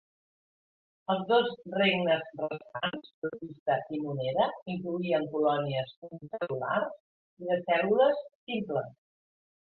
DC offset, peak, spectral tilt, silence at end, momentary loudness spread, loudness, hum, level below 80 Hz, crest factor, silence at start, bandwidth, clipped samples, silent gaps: under 0.1%; -12 dBFS; -9 dB/octave; 0.8 s; 12 LU; -30 LUFS; none; -72 dBFS; 18 dB; 1.1 s; 4.6 kHz; under 0.1%; 3.14-3.22 s, 3.59-3.66 s, 4.62-4.66 s, 5.97-6.02 s, 7.00-7.37 s, 8.35-8.47 s